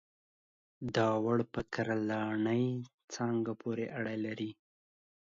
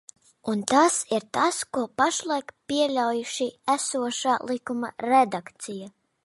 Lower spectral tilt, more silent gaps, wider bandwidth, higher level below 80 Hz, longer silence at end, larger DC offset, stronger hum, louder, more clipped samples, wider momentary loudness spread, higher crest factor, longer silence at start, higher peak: first, -6.5 dB/octave vs -2.5 dB/octave; first, 2.94-2.98 s, 3.04-3.08 s vs none; second, 7.6 kHz vs 11.5 kHz; about the same, -66 dBFS vs -70 dBFS; first, 0.7 s vs 0.35 s; neither; neither; second, -35 LUFS vs -25 LUFS; neither; about the same, 10 LU vs 11 LU; about the same, 20 dB vs 22 dB; first, 0.8 s vs 0.45 s; second, -16 dBFS vs -4 dBFS